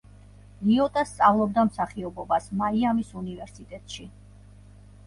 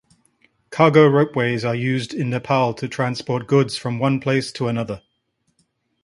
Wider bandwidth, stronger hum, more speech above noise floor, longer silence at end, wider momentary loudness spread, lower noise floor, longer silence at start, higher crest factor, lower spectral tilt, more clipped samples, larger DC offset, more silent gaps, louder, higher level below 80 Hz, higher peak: about the same, 11.5 kHz vs 11.5 kHz; first, 50 Hz at -45 dBFS vs none; second, 24 dB vs 51 dB; about the same, 0.95 s vs 1.05 s; first, 19 LU vs 11 LU; second, -49 dBFS vs -70 dBFS; about the same, 0.6 s vs 0.7 s; about the same, 20 dB vs 20 dB; about the same, -6.5 dB/octave vs -6.5 dB/octave; neither; neither; neither; second, -25 LUFS vs -19 LUFS; first, -52 dBFS vs -58 dBFS; second, -8 dBFS vs 0 dBFS